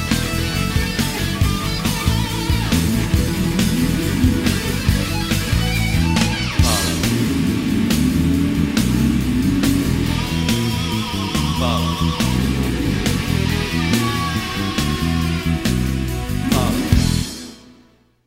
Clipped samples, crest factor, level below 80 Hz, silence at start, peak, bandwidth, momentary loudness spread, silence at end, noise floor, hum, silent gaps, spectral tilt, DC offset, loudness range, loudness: under 0.1%; 18 dB; -26 dBFS; 0 s; 0 dBFS; 16.5 kHz; 3 LU; 0.55 s; -52 dBFS; none; none; -5 dB/octave; under 0.1%; 2 LU; -19 LUFS